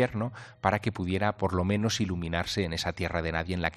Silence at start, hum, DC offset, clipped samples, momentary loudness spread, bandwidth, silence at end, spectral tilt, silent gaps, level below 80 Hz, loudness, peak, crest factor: 0 s; none; under 0.1%; under 0.1%; 3 LU; 13.5 kHz; 0 s; -5.5 dB/octave; none; -52 dBFS; -30 LUFS; -8 dBFS; 22 dB